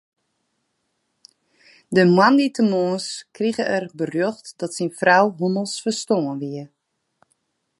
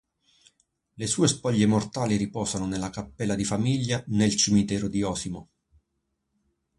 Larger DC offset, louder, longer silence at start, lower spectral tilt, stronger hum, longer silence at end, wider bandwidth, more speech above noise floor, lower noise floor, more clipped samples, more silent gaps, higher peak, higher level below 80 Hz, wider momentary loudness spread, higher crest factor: neither; first, -20 LUFS vs -26 LUFS; first, 1.9 s vs 1 s; about the same, -5 dB/octave vs -4.5 dB/octave; neither; second, 1.15 s vs 1.35 s; about the same, 11.5 kHz vs 11.5 kHz; about the same, 53 dB vs 53 dB; second, -73 dBFS vs -78 dBFS; neither; neither; first, -2 dBFS vs -8 dBFS; second, -72 dBFS vs -52 dBFS; first, 14 LU vs 10 LU; about the same, 20 dB vs 18 dB